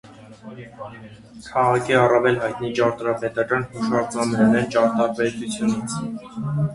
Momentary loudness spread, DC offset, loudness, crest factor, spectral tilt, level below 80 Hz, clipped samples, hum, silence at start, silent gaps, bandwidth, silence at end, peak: 20 LU; under 0.1%; -21 LUFS; 20 dB; -6 dB/octave; -54 dBFS; under 0.1%; none; 0.05 s; none; 11.5 kHz; 0 s; -2 dBFS